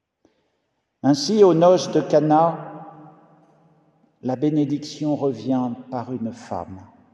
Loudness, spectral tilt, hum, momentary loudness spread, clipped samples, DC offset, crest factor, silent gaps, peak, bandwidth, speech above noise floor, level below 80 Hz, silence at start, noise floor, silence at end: -20 LUFS; -6.5 dB/octave; none; 16 LU; under 0.1%; under 0.1%; 18 dB; none; -4 dBFS; 10.5 kHz; 53 dB; -70 dBFS; 1.05 s; -73 dBFS; 0.3 s